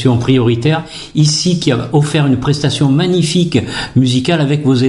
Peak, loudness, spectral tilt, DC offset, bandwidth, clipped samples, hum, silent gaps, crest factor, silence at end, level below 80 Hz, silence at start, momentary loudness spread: 0 dBFS; -13 LUFS; -5.5 dB/octave; under 0.1%; 11.5 kHz; under 0.1%; none; none; 12 dB; 0 s; -40 dBFS; 0 s; 4 LU